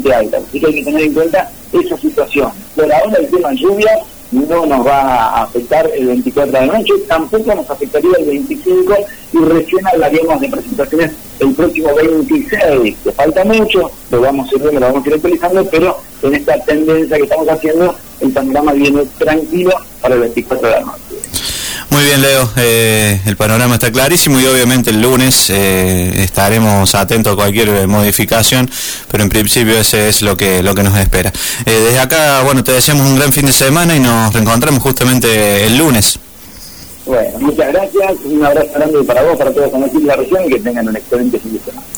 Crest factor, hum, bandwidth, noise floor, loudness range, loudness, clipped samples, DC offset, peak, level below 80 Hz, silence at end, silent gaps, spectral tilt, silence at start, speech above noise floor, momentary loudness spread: 10 dB; none; over 20 kHz; -32 dBFS; 4 LU; -11 LUFS; under 0.1%; 0.8%; 0 dBFS; -32 dBFS; 0 s; none; -4 dB/octave; 0 s; 22 dB; 7 LU